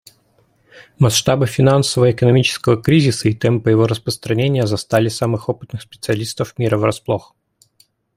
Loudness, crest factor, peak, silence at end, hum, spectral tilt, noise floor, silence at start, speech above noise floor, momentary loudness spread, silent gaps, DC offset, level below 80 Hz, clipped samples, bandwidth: -16 LUFS; 16 dB; -2 dBFS; 0.95 s; none; -5.5 dB/octave; -58 dBFS; 0.75 s; 42 dB; 9 LU; none; under 0.1%; -48 dBFS; under 0.1%; 15.5 kHz